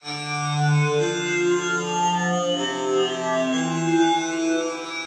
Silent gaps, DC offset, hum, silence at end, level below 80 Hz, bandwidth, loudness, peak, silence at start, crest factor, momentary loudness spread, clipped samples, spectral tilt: none; under 0.1%; none; 0 s; -70 dBFS; 10 kHz; -22 LUFS; -10 dBFS; 0.05 s; 14 dB; 4 LU; under 0.1%; -4.5 dB/octave